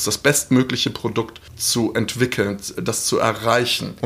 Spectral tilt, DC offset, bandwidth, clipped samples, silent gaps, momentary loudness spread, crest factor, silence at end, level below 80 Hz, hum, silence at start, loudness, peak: -3.5 dB/octave; under 0.1%; 15.5 kHz; under 0.1%; none; 7 LU; 18 dB; 0 s; -50 dBFS; none; 0 s; -20 LUFS; -2 dBFS